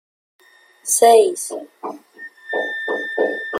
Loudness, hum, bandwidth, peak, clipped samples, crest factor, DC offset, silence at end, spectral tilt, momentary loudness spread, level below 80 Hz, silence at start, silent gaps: -17 LUFS; none; 16.5 kHz; -2 dBFS; under 0.1%; 18 dB; under 0.1%; 0 s; -0.5 dB/octave; 22 LU; -72 dBFS; 0.85 s; none